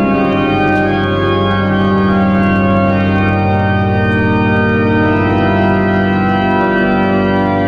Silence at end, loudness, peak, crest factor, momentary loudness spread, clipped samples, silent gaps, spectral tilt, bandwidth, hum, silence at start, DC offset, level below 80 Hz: 0 s; -12 LUFS; -2 dBFS; 10 dB; 1 LU; under 0.1%; none; -9 dB/octave; 5.8 kHz; none; 0 s; under 0.1%; -34 dBFS